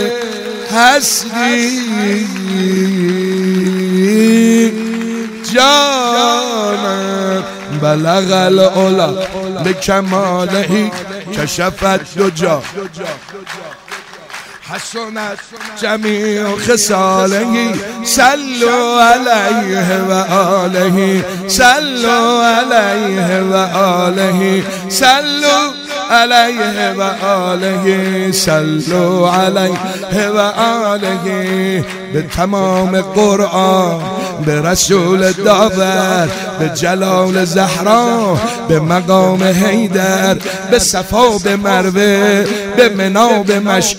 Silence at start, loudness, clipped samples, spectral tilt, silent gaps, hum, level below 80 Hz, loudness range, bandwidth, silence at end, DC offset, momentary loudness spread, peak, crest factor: 0 s; -12 LUFS; 0.4%; -4 dB/octave; none; none; -42 dBFS; 4 LU; 16.5 kHz; 0 s; under 0.1%; 10 LU; 0 dBFS; 12 dB